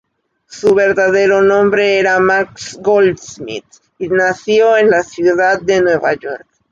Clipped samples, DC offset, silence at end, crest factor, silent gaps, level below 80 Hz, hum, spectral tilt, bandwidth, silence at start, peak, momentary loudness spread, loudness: under 0.1%; under 0.1%; 0.35 s; 12 dB; none; -52 dBFS; none; -4.5 dB/octave; 7.8 kHz; 0.5 s; -2 dBFS; 15 LU; -12 LUFS